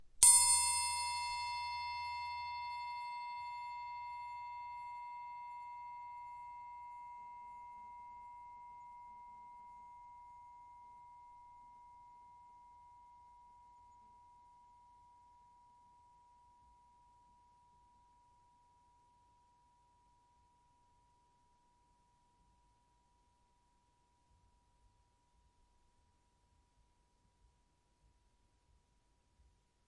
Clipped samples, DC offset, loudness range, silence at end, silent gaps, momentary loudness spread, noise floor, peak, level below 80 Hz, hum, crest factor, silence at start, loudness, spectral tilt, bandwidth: under 0.1%; under 0.1%; 23 LU; 15.7 s; none; 25 LU; -76 dBFS; -8 dBFS; -74 dBFS; none; 36 dB; 0 s; -34 LUFS; 3 dB/octave; 11.5 kHz